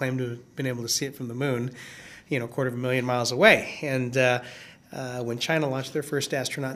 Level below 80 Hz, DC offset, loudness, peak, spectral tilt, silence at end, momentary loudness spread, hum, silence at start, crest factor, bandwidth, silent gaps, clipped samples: -68 dBFS; under 0.1%; -26 LUFS; -2 dBFS; -4 dB/octave; 0 s; 17 LU; none; 0 s; 26 dB; 15.5 kHz; none; under 0.1%